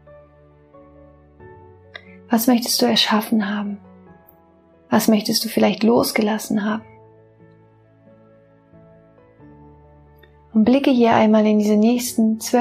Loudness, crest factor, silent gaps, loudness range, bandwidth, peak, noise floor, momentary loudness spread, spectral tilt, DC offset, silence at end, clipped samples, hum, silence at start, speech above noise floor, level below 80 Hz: -18 LUFS; 18 dB; none; 8 LU; 15.5 kHz; -2 dBFS; -52 dBFS; 13 LU; -4.5 dB/octave; under 0.1%; 0 s; under 0.1%; none; 1.4 s; 36 dB; -58 dBFS